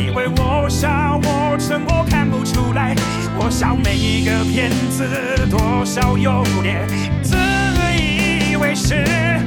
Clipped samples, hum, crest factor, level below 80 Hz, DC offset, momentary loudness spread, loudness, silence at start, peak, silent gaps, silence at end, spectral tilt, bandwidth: under 0.1%; none; 14 dB; -26 dBFS; 0.3%; 3 LU; -17 LUFS; 0 s; -2 dBFS; none; 0 s; -5.5 dB/octave; 19.5 kHz